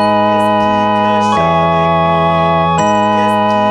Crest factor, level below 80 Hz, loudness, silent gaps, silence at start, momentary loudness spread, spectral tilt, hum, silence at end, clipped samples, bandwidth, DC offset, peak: 10 dB; -38 dBFS; -11 LUFS; none; 0 s; 0 LU; -6 dB/octave; none; 0 s; under 0.1%; 12 kHz; under 0.1%; -2 dBFS